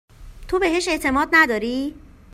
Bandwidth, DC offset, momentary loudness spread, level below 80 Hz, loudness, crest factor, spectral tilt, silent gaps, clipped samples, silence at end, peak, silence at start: 16 kHz; under 0.1%; 11 LU; -42 dBFS; -19 LUFS; 20 dB; -3.5 dB/octave; none; under 0.1%; 0.35 s; -2 dBFS; 0.2 s